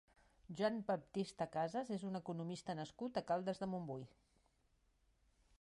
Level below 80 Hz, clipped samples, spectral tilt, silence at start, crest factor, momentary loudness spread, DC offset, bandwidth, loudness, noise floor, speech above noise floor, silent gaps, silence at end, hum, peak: -76 dBFS; under 0.1%; -6.5 dB/octave; 0.45 s; 18 dB; 7 LU; under 0.1%; 11.5 kHz; -43 LUFS; -78 dBFS; 35 dB; none; 1.55 s; none; -26 dBFS